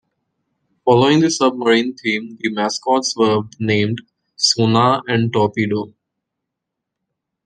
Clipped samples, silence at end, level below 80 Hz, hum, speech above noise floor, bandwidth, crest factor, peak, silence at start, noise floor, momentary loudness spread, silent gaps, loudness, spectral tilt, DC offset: under 0.1%; 1.55 s; -62 dBFS; none; 64 dB; 10 kHz; 16 dB; -2 dBFS; 0.85 s; -80 dBFS; 9 LU; none; -17 LUFS; -4.5 dB/octave; under 0.1%